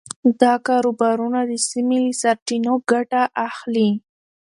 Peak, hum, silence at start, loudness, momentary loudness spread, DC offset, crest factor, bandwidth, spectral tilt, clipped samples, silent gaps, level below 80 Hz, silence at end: 0 dBFS; none; 0.25 s; -19 LUFS; 5 LU; under 0.1%; 18 dB; 11.5 kHz; -4 dB/octave; under 0.1%; 2.42-2.46 s; -70 dBFS; 0.6 s